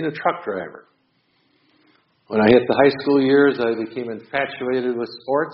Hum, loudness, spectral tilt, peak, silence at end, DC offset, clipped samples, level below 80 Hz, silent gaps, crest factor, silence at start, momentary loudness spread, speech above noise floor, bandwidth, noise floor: none; -19 LUFS; -4 dB/octave; -2 dBFS; 0 s; under 0.1%; under 0.1%; -58 dBFS; none; 20 dB; 0 s; 13 LU; 45 dB; 5.8 kHz; -65 dBFS